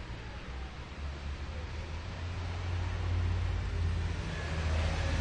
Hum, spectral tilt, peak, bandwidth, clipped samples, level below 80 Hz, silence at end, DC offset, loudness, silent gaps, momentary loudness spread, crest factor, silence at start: none; -6 dB/octave; -20 dBFS; 9.4 kHz; under 0.1%; -40 dBFS; 0 s; under 0.1%; -37 LUFS; none; 10 LU; 14 dB; 0 s